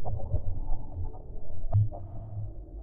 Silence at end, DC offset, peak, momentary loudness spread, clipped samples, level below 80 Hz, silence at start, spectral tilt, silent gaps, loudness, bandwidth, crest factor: 0 s; under 0.1%; -14 dBFS; 14 LU; under 0.1%; -34 dBFS; 0 s; -13.5 dB/octave; none; -35 LUFS; 1.3 kHz; 12 dB